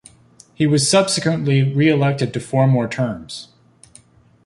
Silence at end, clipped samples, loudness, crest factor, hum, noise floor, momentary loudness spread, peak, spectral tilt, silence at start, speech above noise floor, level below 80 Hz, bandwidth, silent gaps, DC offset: 1 s; under 0.1%; -17 LUFS; 16 dB; none; -50 dBFS; 9 LU; -2 dBFS; -5.5 dB/octave; 0.6 s; 33 dB; -54 dBFS; 11.5 kHz; none; under 0.1%